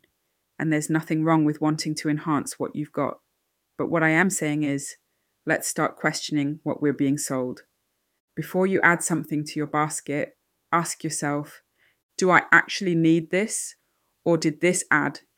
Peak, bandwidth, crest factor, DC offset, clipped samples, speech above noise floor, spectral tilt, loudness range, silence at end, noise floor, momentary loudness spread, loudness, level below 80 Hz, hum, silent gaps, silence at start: -2 dBFS; 17 kHz; 22 dB; under 0.1%; under 0.1%; 52 dB; -4.5 dB/octave; 4 LU; 0.2 s; -75 dBFS; 11 LU; -24 LUFS; -72 dBFS; none; 8.20-8.28 s, 12.03-12.09 s; 0.6 s